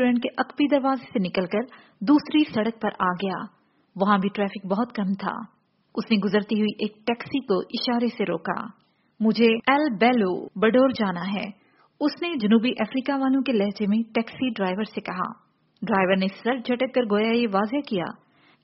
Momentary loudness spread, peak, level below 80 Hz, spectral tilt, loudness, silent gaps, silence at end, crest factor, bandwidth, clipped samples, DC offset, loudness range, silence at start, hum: 10 LU; -4 dBFS; -66 dBFS; -4.5 dB/octave; -24 LUFS; none; 0.5 s; 20 dB; 5.8 kHz; under 0.1%; under 0.1%; 4 LU; 0 s; none